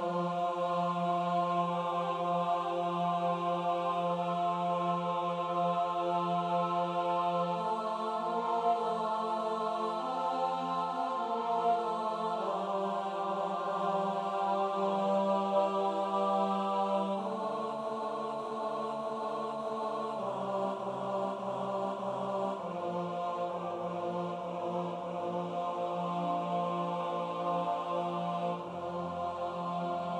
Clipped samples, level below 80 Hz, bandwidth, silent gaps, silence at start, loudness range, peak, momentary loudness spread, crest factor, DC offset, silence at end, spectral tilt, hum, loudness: under 0.1%; -80 dBFS; 10.5 kHz; none; 0 s; 4 LU; -18 dBFS; 6 LU; 16 dB; under 0.1%; 0 s; -7 dB/octave; none; -33 LUFS